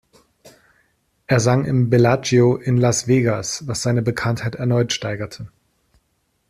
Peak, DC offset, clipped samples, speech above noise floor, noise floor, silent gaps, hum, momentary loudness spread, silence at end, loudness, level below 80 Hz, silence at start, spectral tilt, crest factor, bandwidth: -2 dBFS; under 0.1%; under 0.1%; 50 dB; -68 dBFS; none; none; 10 LU; 1 s; -19 LUFS; -52 dBFS; 0.45 s; -5.5 dB/octave; 16 dB; 13.5 kHz